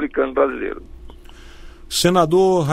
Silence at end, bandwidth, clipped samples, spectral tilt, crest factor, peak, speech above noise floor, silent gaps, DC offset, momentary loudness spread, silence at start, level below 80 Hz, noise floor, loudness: 0 s; 16 kHz; under 0.1%; -5 dB/octave; 18 dB; -2 dBFS; 22 dB; none; under 0.1%; 14 LU; 0 s; -40 dBFS; -39 dBFS; -18 LUFS